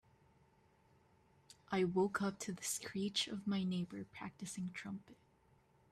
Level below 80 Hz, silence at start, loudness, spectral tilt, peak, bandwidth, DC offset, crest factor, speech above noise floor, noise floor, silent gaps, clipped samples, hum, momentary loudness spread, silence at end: -76 dBFS; 1.5 s; -41 LUFS; -4.5 dB/octave; -24 dBFS; 14 kHz; under 0.1%; 18 dB; 31 dB; -72 dBFS; none; under 0.1%; none; 12 LU; 0.75 s